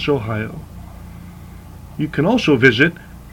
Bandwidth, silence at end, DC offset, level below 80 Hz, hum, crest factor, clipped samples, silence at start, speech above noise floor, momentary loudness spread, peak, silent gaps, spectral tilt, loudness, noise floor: 17.5 kHz; 0.05 s; under 0.1%; -42 dBFS; none; 18 dB; under 0.1%; 0 s; 20 dB; 25 LU; 0 dBFS; none; -6.5 dB/octave; -16 LUFS; -36 dBFS